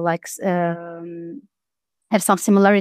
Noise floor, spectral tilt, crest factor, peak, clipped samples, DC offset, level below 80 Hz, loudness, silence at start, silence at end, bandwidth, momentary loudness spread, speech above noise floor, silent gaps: -86 dBFS; -5.5 dB/octave; 18 dB; -2 dBFS; under 0.1%; under 0.1%; -74 dBFS; -19 LUFS; 0 s; 0 s; 15.5 kHz; 20 LU; 67 dB; none